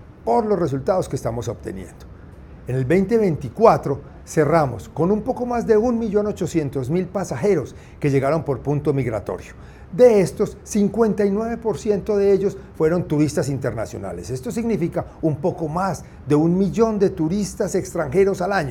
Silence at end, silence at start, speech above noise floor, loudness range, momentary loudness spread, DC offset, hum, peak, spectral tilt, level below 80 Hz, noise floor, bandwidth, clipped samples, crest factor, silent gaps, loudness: 0 s; 0 s; 20 dB; 4 LU; 11 LU; under 0.1%; none; 0 dBFS; -7 dB/octave; -44 dBFS; -40 dBFS; 16.5 kHz; under 0.1%; 20 dB; none; -21 LUFS